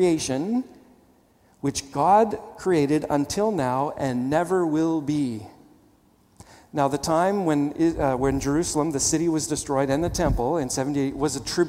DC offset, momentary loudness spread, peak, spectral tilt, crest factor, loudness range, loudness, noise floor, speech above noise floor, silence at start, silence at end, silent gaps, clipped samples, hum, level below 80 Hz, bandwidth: under 0.1%; 6 LU; -6 dBFS; -5 dB/octave; 18 dB; 3 LU; -24 LUFS; -59 dBFS; 36 dB; 0 s; 0 s; none; under 0.1%; none; -42 dBFS; 16 kHz